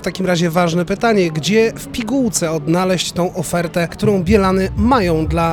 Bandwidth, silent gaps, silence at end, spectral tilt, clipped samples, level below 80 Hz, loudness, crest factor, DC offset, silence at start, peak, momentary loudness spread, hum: 18 kHz; none; 0 s; -5.5 dB/octave; under 0.1%; -32 dBFS; -16 LUFS; 16 dB; under 0.1%; 0 s; 0 dBFS; 5 LU; none